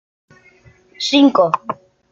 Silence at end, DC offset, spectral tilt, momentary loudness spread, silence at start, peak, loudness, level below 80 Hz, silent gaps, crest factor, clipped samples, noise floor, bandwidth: 0.4 s; under 0.1%; -4 dB/octave; 17 LU; 1 s; 0 dBFS; -15 LUFS; -64 dBFS; none; 18 dB; under 0.1%; -50 dBFS; 7.6 kHz